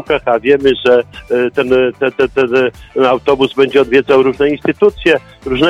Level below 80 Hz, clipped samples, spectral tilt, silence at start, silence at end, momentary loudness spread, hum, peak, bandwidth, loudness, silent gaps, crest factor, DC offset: -40 dBFS; under 0.1%; -6 dB/octave; 0 s; 0 s; 5 LU; none; 0 dBFS; 8.6 kHz; -12 LUFS; none; 12 dB; under 0.1%